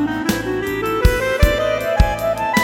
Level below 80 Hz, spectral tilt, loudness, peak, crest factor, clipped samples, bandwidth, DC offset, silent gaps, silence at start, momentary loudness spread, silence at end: -22 dBFS; -5.5 dB/octave; -18 LUFS; 0 dBFS; 16 dB; under 0.1%; 18 kHz; under 0.1%; none; 0 s; 4 LU; 0 s